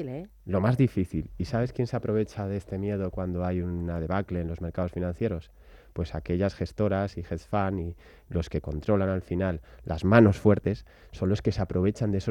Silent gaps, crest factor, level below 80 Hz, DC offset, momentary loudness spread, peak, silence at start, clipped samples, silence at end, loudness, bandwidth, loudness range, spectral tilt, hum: none; 22 dB; -46 dBFS; under 0.1%; 11 LU; -6 dBFS; 0 s; under 0.1%; 0 s; -28 LUFS; 10.5 kHz; 6 LU; -8.5 dB/octave; none